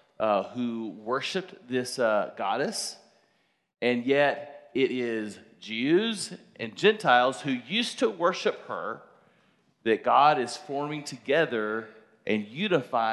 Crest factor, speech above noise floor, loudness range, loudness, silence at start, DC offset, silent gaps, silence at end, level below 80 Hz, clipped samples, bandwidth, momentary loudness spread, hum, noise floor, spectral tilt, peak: 22 dB; 43 dB; 3 LU; -27 LUFS; 0.2 s; under 0.1%; none; 0 s; -80 dBFS; under 0.1%; 12.5 kHz; 13 LU; none; -70 dBFS; -4 dB/octave; -6 dBFS